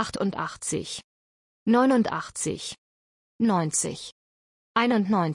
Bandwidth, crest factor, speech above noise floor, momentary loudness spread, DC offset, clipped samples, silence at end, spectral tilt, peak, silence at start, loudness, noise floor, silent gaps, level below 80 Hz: 11 kHz; 18 dB; over 65 dB; 15 LU; under 0.1%; under 0.1%; 0 s; -4.5 dB/octave; -8 dBFS; 0 s; -25 LUFS; under -90 dBFS; 1.04-1.66 s, 2.78-3.39 s, 4.12-4.75 s; -62 dBFS